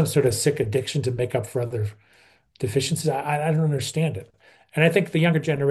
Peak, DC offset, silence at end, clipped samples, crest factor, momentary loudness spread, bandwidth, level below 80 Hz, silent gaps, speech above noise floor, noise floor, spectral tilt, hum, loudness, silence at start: -4 dBFS; under 0.1%; 0 s; under 0.1%; 18 dB; 9 LU; 12.5 kHz; -58 dBFS; none; 35 dB; -57 dBFS; -5.5 dB/octave; none; -23 LUFS; 0 s